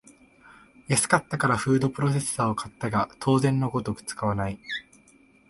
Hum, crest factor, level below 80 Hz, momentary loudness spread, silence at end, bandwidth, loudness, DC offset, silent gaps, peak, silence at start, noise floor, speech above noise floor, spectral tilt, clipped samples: none; 20 dB; -54 dBFS; 9 LU; 0.7 s; 12 kHz; -26 LUFS; under 0.1%; none; -6 dBFS; 0.9 s; -58 dBFS; 32 dB; -5 dB/octave; under 0.1%